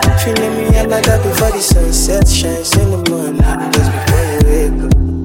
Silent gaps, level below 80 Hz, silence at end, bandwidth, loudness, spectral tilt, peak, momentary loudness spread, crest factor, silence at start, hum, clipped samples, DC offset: none; -16 dBFS; 0 s; 17 kHz; -13 LUFS; -5 dB/octave; 0 dBFS; 3 LU; 12 dB; 0 s; none; under 0.1%; under 0.1%